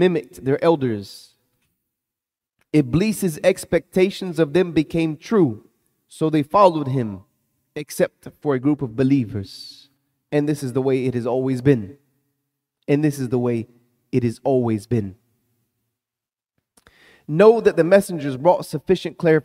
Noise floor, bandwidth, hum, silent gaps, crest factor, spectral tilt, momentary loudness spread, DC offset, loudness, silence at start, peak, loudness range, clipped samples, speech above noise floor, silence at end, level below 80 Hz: -89 dBFS; 16 kHz; none; none; 20 dB; -7 dB/octave; 14 LU; under 0.1%; -20 LUFS; 0 s; -2 dBFS; 5 LU; under 0.1%; 70 dB; 0.05 s; -54 dBFS